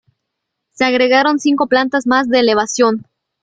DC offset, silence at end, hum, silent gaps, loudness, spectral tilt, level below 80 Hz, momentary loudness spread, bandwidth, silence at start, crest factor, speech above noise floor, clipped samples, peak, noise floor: under 0.1%; 0.4 s; none; none; -14 LUFS; -3 dB/octave; -58 dBFS; 4 LU; 9.2 kHz; 0.8 s; 14 dB; 63 dB; under 0.1%; 0 dBFS; -76 dBFS